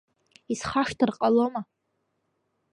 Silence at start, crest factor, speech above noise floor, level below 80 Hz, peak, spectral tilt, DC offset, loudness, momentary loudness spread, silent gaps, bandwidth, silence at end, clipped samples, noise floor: 0.5 s; 20 dB; 52 dB; -60 dBFS; -8 dBFS; -5 dB/octave; under 0.1%; -26 LUFS; 13 LU; none; 11 kHz; 1.1 s; under 0.1%; -76 dBFS